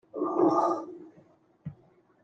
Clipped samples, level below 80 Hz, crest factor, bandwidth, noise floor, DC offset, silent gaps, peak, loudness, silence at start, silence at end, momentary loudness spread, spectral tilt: under 0.1%; -74 dBFS; 18 dB; 7.6 kHz; -62 dBFS; under 0.1%; none; -12 dBFS; -27 LUFS; 0.15 s; 0.5 s; 22 LU; -8 dB/octave